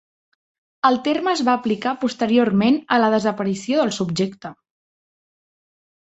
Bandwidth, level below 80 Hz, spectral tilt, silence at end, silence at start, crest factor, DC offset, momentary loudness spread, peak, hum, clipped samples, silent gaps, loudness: 8.2 kHz; -62 dBFS; -5.5 dB/octave; 1.6 s; 0.85 s; 18 dB; under 0.1%; 7 LU; -2 dBFS; none; under 0.1%; none; -20 LUFS